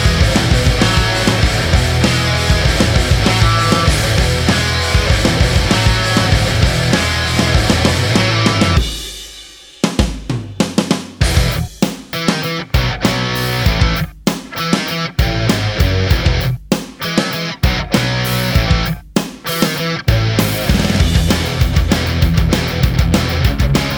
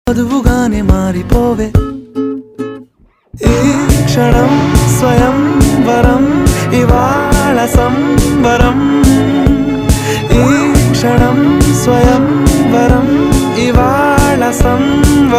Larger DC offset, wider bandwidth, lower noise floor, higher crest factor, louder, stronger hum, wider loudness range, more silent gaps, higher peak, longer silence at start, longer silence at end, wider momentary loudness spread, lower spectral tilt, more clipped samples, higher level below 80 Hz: neither; first, over 20 kHz vs 16 kHz; second, -36 dBFS vs -47 dBFS; about the same, 14 dB vs 10 dB; second, -15 LUFS vs -10 LUFS; neither; about the same, 4 LU vs 4 LU; neither; about the same, 0 dBFS vs 0 dBFS; about the same, 0 s vs 0.05 s; about the same, 0 s vs 0 s; first, 7 LU vs 4 LU; second, -4.5 dB/octave vs -6 dB/octave; second, under 0.1% vs 1%; about the same, -20 dBFS vs -18 dBFS